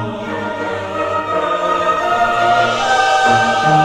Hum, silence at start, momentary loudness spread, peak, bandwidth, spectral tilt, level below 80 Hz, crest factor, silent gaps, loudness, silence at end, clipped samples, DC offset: none; 0 s; 9 LU; -2 dBFS; 12.5 kHz; -4 dB/octave; -46 dBFS; 14 dB; none; -15 LUFS; 0 s; under 0.1%; under 0.1%